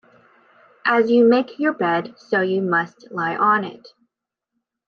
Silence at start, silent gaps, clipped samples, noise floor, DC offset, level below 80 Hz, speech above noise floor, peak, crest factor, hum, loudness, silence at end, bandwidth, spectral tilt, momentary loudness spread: 0.85 s; none; under 0.1%; -82 dBFS; under 0.1%; -74 dBFS; 63 dB; -6 dBFS; 16 dB; none; -19 LUFS; 1.1 s; 6.6 kHz; -7.5 dB/octave; 10 LU